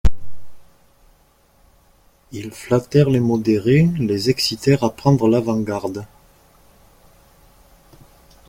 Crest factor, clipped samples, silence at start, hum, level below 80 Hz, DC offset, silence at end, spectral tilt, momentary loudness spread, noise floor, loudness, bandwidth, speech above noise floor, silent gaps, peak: 18 dB; under 0.1%; 0.05 s; none; -34 dBFS; under 0.1%; 2.45 s; -6.5 dB/octave; 16 LU; -56 dBFS; -18 LUFS; 16.5 kHz; 38 dB; none; -2 dBFS